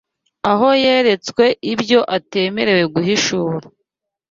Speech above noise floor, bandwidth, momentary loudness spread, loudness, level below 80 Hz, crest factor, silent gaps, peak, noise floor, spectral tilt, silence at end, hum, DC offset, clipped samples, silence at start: 60 dB; 7.8 kHz; 8 LU; -16 LUFS; -56 dBFS; 16 dB; none; -2 dBFS; -75 dBFS; -4.5 dB/octave; 0.65 s; none; under 0.1%; under 0.1%; 0.45 s